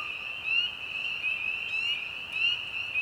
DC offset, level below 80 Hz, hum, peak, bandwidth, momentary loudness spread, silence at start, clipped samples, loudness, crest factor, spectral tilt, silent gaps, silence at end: under 0.1%; -66 dBFS; none; -16 dBFS; over 20 kHz; 6 LU; 0 s; under 0.1%; -29 LUFS; 16 dB; -0.5 dB/octave; none; 0 s